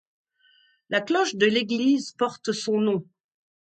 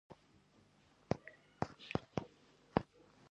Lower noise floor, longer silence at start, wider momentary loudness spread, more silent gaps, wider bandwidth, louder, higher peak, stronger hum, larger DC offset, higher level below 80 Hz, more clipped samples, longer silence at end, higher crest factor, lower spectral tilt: second, -62 dBFS vs -69 dBFS; first, 0.9 s vs 0.1 s; second, 7 LU vs 19 LU; neither; about the same, 9.2 kHz vs 9 kHz; first, -24 LUFS vs -43 LUFS; first, -6 dBFS vs -12 dBFS; neither; neither; second, -74 dBFS vs -64 dBFS; neither; about the same, 0.6 s vs 0.5 s; second, 20 dB vs 32 dB; second, -4 dB/octave vs -7 dB/octave